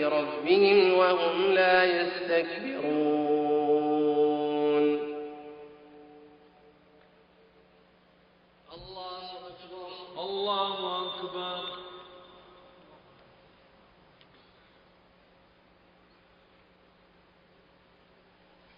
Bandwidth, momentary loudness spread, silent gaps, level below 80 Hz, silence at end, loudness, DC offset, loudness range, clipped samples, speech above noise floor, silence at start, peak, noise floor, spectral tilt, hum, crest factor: 5.4 kHz; 23 LU; none; -70 dBFS; 6.6 s; -26 LUFS; under 0.1%; 22 LU; under 0.1%; 37 dB; 0 s; -8 dBFS; -62 dBFS; -2 dB/octave; none; 22 dB